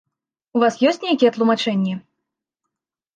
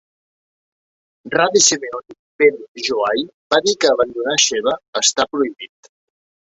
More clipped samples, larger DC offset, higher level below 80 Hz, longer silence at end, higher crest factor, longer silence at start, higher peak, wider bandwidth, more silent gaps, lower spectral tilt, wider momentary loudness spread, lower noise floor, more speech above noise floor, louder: neither; neither; second, -72 dBFS vs -62 dBFS; first, 1.15 s vs 0.85 s; about the same, 18 dB vs 18 dB; second, 0.55 s vs 1.25 s; second, -4 dBFS vs 0 dBFS; about the same, 9 kHz vs 8.2 kHz; second, none vs 2.19-2.39 s, 2.68-2.75 s, 3.34-3.50 s, 4.88-4.93 s; first, -5.5 dB/octave vs -1 dB/octave; about the same, 9 LU vs 11 LU; second, -82 dBFS vs under -90 dBFS; second, 64 dB vs over 73 dB; about the same, -19 LUFS vs -17 LUFS